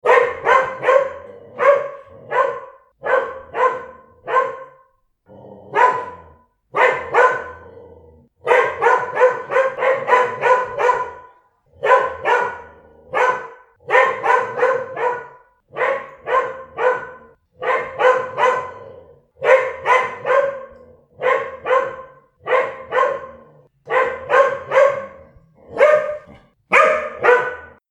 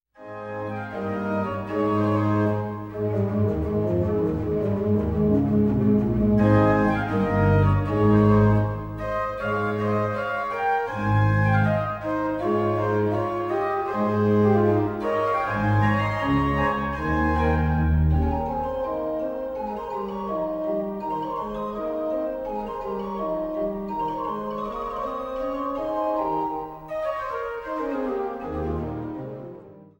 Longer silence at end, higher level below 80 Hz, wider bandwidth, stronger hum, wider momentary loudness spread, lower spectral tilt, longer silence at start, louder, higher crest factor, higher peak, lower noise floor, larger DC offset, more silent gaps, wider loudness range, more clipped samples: about the same, 0.2 s vs 0.15 s; second, -60 dBFS vs -38 dBFS; second, 9.8 kHz vs 16 kHz; neither; first, 16 LU vs 10 LU; second, -3.5 dB/octave vs -9 dB/octave; second, 0.05 s vs 0.2 s; first, -18 LUFS vs -24 LUFS; about the same, 18 dB vs 16 dB; first, 0 dBFS vs -6 dBFS; first, -58 dBFS vs -44 dBFS; neither; neither; second, 5 LU vs 8 LU; neither